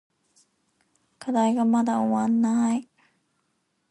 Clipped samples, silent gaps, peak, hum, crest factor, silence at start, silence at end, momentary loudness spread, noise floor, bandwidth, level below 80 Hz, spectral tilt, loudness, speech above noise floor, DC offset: under 0.1%; none; -12 dBFS; none; 14 dB; 1.2 s; 1.05 s; 7 LU; -73 dBFS; 11 kHz; -74 dBFS; -6 dB/octave; -23 LUFS; 51 dB; under 0.1%